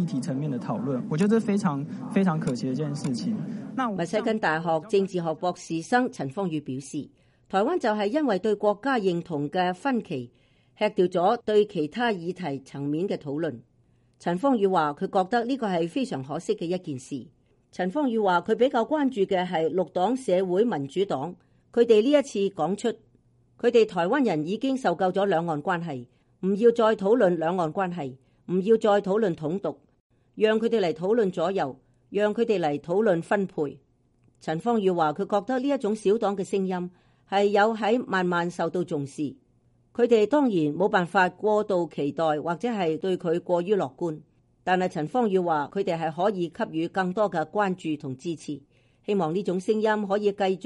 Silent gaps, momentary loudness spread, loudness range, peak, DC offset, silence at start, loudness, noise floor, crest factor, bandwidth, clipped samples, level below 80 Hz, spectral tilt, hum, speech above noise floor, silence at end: 30.00-30.10 s; 11 LU; 3 LU; -8 dBFS; under 0.1%; 0 s; -26 LUFS; -64 dBFS; 18 dB; 11.5 kHz; under 0.1%; -68 dBFS; -6.5 dB/octave; none; 39 dB; 0 s